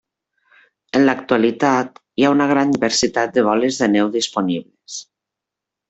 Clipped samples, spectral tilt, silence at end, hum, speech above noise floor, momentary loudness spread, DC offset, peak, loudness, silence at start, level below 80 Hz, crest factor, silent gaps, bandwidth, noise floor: under 0.1%; -4 dB/octave; 0.85 s; none; 68 dB; 11 LU; under 0.1%; -2 dBFS; -17 LUFS; 0.95 s; -56 dBFS; 16 dB; none; 8.2 kHz; -84 dBFS